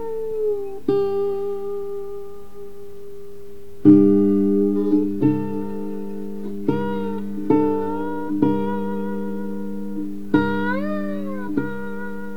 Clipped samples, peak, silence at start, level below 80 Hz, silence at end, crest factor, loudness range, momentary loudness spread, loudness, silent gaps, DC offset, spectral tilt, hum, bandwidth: under 0.1%; -2 dBFS; 0 s; -54 dBFS; 0 s; 20 dB; 6 LU; 21 LU; -22 LUFS; none; 3%; -9 dB/octave; none; 5.2 kHz